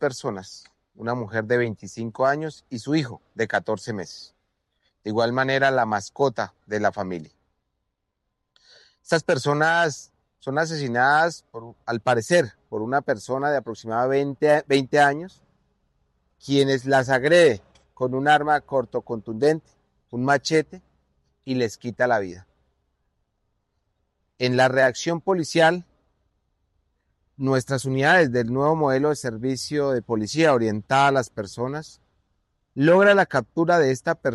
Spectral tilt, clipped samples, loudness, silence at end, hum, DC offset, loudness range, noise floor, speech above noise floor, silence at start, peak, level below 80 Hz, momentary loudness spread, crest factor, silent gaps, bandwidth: -5 dB/octave; under 0.1%; -22 LUFS; 0 s; none; under 0.1%; 6 LU; -78 dBFS; 56 dB; 0 s; -6 dBFS; -64 dBFS; 14 LU; 18 dB; none; 12.5 kHz